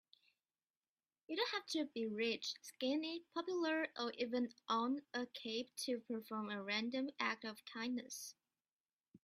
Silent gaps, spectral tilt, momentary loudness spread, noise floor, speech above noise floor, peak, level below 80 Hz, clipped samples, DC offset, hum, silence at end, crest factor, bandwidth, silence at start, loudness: 8.72-8.85 s, 8.93-9.00 s; -3 dB/octave; 7 LU; under -90 dBFS; over 48 dB; -22 dBFS; -90 dBFS; under 0.1%; under 0.1%; none; 0.1 s; 22 dB; 15.5 kHz; 1.3 s; -42 LUFS